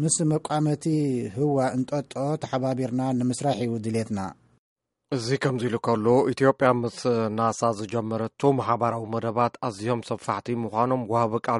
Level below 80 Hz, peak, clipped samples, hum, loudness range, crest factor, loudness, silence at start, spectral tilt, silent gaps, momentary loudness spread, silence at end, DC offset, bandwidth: -64 dBFS; -4 dBFS; under 0.1%; none; 4 LU; 20 dB; -25 LUFS; 0 s; -6 dB/octave; 4.58-4.76 s; 7 LU; 0 s; under 0.1%; 11.5 kHz